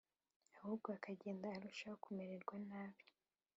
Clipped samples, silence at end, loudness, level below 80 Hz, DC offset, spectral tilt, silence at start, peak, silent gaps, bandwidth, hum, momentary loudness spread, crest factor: under 0.1%; 0.55 s; -51 LUFS; under -90 dBFS; under 0.1%; -5.5 dB/octave; 0.55 s; -30 dBFS; none; 7.6 kHz; none; 7 LU; 20 dB